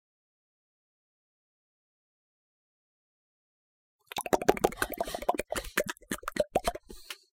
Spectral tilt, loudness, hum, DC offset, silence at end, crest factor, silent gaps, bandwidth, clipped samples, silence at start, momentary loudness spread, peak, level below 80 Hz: -3.5 dB/octave; -32 LUFS; none; under 0.1%; 0.25 s; 30 dB; none; 17 kHz; under 0.1%; 4.15 s; 12 LU; -6 dBFS; -54 dBFS